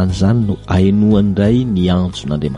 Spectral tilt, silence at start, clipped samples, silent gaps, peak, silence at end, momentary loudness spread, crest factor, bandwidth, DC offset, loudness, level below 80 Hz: -8 dB/octave; 0 s; under 0.1%; none; -2 dBFS; 0 s; 5 LU; 12 dB; 10.5 kHz; under 0.1%; -14 LUFS; -32 dBFS